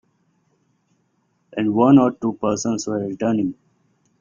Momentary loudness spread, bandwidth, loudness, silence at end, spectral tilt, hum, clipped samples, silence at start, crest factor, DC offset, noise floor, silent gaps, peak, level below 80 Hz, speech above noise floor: 11 LU; 7.4 kHz; -19 LUFS; 0.65 s; -6.5 dB/octave; none; under 0.1%; 1.55 s; 20 dB; under 0.1%; -67 dBFS; none; -2 dBFS; -58 dBFS; 48 dB